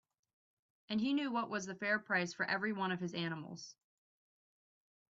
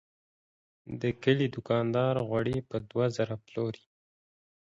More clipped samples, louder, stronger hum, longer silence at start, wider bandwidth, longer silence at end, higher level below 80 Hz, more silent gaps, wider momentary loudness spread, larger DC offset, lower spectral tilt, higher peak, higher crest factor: neither; second, -37 LUFS vs -30 LUFS; neither; about the same, 0.9 s vs 0.85 s; about the same, 7.8 kHz vs 7.8 kHz; first, 1.45 s vs 1.05 s; second, -82 dBFS vs -62 dBFS; neither; first, 11 LU vs 8 LU; neither; second, -3.5 dB/octave vs -7.5 dB/octave; second, -20 dBFS vs -12 dBFS; about the same, 20 dB vs 20 dB